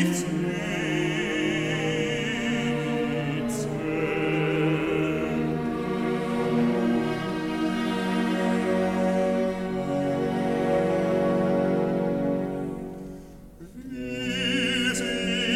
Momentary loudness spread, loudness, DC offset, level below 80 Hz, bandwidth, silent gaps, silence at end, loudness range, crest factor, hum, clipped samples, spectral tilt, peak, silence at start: 6 LU; -26 LUFS; under 0.1%; -50 dBFS; 15.5 kHz; none; 0 s; 3 LU; 14 dB; none; under 0.1%; -5.5 dB/octave; -10 dBFS; 0 s